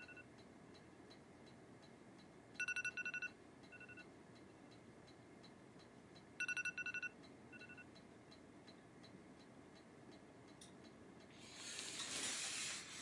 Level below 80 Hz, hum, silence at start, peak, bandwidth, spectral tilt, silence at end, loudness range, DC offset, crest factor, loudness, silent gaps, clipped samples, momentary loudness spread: -84 dBFS; none; 0 s; -28 dBFS; 11.5 kHz; -1 dB/octave; 0 s; 12 LU; under 0.1%; 24 dB; -47 LUFS; none; under 0.1%; 19 LU